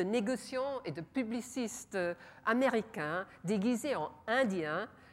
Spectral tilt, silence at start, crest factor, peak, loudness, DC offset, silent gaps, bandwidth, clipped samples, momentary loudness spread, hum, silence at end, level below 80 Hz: -5 dB/octave; 0 s; 18 dB; -18 dBFS; -35 LUFS; under 0.1%; none; 15.5 kHz; under 0.1%; 8 LU; none; 0.1 s; -74 dBFS